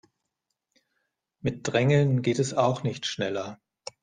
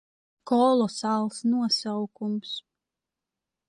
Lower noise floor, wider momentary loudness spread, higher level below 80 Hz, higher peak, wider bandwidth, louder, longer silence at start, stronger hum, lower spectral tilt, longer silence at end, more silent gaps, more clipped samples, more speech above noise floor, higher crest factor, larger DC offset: second, -82 dBFS vs -88 dBFS; first, 15 LU vs 11 LU; first, -62 dBFS vs -76 dBFS; first, -8 dBFS vs -12 dBFS; second, 9.6 kHz vs 11.5 kHz; about the same, -26 LUFS vs -26 LUFS; first, 1.45 s vs 0.45 s; neither; about the same, -6 dB/octave vs -5 dB/octave; second, 0.5 s vs 1.1 s; neither; neither; second, 57 dB vs 62 dB; about the same, 20 dB vs 16 dB; neither